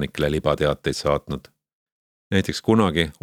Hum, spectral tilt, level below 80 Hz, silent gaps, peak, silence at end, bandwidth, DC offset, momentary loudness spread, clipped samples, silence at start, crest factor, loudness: none; -5.5 dB/octave; -42 dBFS; 1.73-1.86 s, 1.92-2.31 s; -4 dBFS; 0.1 s; 17 kHz; under 0.1%; 7 LU; under 0.1%; 0 s; 20 dB; -22 LUFS